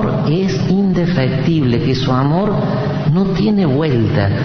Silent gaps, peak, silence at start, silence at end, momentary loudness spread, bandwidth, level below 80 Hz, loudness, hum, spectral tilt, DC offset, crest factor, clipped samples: none; -2 dBFS; 0 s; 0 s; 2 LU; 6.6 kHz; -36 dBFS; -15 LUFS; none; -8 dB/octave; under 0.1%; 12 dB; under 0.1%